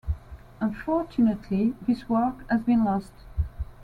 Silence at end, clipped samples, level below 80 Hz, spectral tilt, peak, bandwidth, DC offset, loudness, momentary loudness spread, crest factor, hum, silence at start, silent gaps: 0 s; under 0.1%; -40 dBFS; -9 dB/octave; -12 dBFS; 4.9 kHz; under 0.1%; -26 LUFS; 10 LU; 14 dB; none; 0.05 s; none